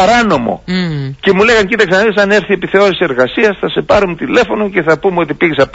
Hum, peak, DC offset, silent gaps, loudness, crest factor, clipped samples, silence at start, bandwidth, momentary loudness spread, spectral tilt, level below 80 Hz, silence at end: none; 0 dBFS; under 0.1%; none; -11 LUFS; 10 dB; under 0.1%; 0 s; 8 kHz; 7 LU; -5.5 dB/octave; -38 dBFS; 0.05 s